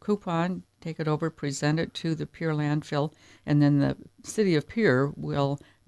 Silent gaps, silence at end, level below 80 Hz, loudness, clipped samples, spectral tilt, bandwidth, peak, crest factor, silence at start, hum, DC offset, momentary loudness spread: none; 0.3 s; -58 dBFS; -27 LUFS; under 0.1%; -6.5 dB/octave; 11 kHz; -10 dBFS; 18 dB; 0.05 s; none; under 0.1%; 10 LU